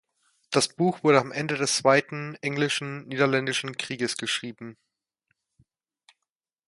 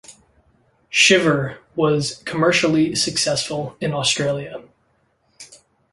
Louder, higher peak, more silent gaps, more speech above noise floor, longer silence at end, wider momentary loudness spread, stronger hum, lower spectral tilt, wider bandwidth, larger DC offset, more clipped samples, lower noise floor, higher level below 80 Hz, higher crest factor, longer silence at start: second, -25 LUFS vs -18 LUFS; about the same, -4 dBFS vs -2 dBFS; neither; first, 61 dB vs 45 dB; first, 1.95 s vs 0.4 s; about the same, 12 LU vs 13 LU; neither; about the same, -4 dB/octave vs -3.5 dB/octave; about the same, 11.5 kHz vs 11.5 kHz; neither; neither; first, -87 dBFS vs -64 dBFS; second, -72 dBFS vs -56 dBFS; about the same, 24 dB vs 20 dB; first, 0.5 s vs 0.1 s